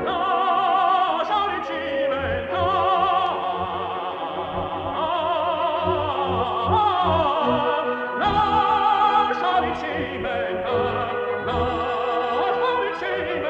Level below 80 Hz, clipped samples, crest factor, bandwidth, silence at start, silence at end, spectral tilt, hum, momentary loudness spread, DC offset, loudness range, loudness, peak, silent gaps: -50 dBFS; under 0.1%; 14 dB; 8.2 kHz; 0 s; 0 s; -6.5 dB/octave; none; 7 LU; under 0.1%; 4 LU; -22 LUFS; -8 dBFS; none